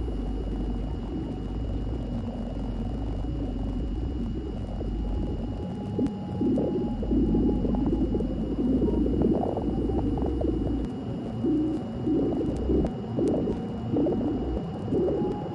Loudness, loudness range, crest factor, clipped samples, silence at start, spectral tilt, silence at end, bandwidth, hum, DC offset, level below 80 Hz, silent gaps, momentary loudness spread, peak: -29 LUFS; 6 LU; 14 dB; under 0.1%; 0 s; -9.5 dB/octave; 0 s; 9.2 kHz; none; under 0.1%; -34 dBFS; none; 8 LU; -12 dBFS